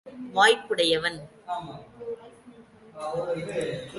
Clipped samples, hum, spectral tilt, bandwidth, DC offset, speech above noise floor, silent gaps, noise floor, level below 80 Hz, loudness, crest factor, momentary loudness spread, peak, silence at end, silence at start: under 0.1%; none; -3 dB/octave; 11.5 kHz; under 0.1%; 25 dB; none; -51 dBFS; -64 dBFS; -25 LUFS; 22 dB; 20 LU; -6 dBFS; 0 s; 0.05 s